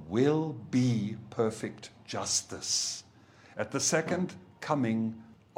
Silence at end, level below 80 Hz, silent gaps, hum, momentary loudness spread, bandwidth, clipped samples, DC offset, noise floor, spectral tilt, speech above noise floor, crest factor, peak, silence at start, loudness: 0.25 s; -70 dBFS; none; none; 13 LU; 16 kHz; under 0.1%; under 0.1%; -57 dBFS; -4 dB/octave; 26 dB; 18 dB; -12 dBFS; 0 s; -31 LUFS